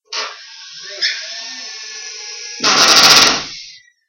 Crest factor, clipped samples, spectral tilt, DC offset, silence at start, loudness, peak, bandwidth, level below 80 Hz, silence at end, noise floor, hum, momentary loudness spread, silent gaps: 16 dB; 0.1%; 0.5 dB/octave; under 0.1%; 0.1 s; -10 LUFS; 0 dBFS; over 20 kHz; -54 dBFS; 0.4 s; -38 dBFS; none; 24 LU; none